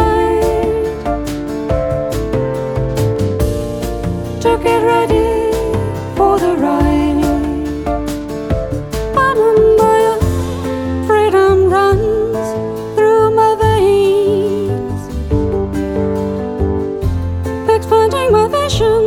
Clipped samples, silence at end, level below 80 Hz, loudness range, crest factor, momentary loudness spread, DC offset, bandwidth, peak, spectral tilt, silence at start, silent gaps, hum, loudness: under 0.1%; 0 s; -26 dBFS; 5 LU; 14 dB; 9 LU; under 0.1%; 17.5 kHz; 0 dBFS; -6.5 dB/octave; 0 s; none; none; -14 LUFS